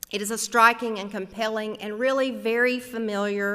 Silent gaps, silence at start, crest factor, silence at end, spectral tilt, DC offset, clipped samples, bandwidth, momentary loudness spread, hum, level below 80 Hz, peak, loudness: none; 0.1 s; 20 dB; 0 s; -3 dB/octave; under 0.1%; under 0.1%; 16 kHz; 12 LU; none; -66 dBFS; -4 dBFS; -24 LUFS